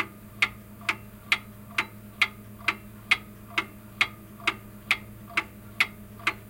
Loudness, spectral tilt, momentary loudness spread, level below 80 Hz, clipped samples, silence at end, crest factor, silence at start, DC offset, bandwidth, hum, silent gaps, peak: -29 LUFS; -2.5 dB/octave; 9 LU; -56 dBFS; under 0.1%; 0 s; 26 dB; 0 s; under 0.1%; 17 kHz; none; none; -6 dBFS